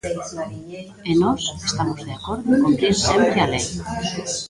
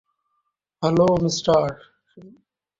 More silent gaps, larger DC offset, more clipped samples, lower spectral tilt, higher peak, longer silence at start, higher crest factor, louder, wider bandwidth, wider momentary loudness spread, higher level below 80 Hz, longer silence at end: neither; neither; neither; second, -4.5 dB/octave vs -6 dB/octave; about the same, -4 dBFS vs -6 dBFS; second, 0.05 s vs 0.8 s; about the same, 18 dB vs 18 dB; about the same, -20 LUFS vs -20 LUFS; first, 11.5 kHz vs 7.8 kHz; first, 14 LU vs 10 LU; first, -42 dBFS vs -54 dBFS; second, 0 s vs 0.5 s